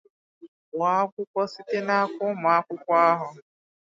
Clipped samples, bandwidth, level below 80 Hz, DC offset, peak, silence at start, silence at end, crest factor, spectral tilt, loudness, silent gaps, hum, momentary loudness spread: under 0.1%; 7.6 kHz; -82 dBFS; under 0.1%; -6 dBFS; 0.45 s; 0.45 s; 18 dB; -6 dB/octave; -24 LUFS; 0.48-0.72 s, 1.12-1.17 s, 1.27-1.34 s; none; 9 LU